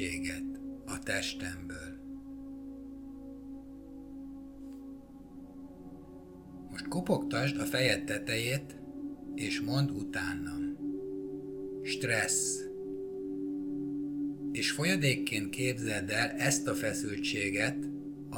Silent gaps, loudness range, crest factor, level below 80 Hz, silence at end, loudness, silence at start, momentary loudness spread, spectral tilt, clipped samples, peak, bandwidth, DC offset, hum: none; 16 LU; 22 dB; -60 dBFS; 0 s; -33 LUFS; 0 s; 18 LU; -4 dB/octave; under 0.1%; -14 dBFS; 19 kHz; under 0.1%; none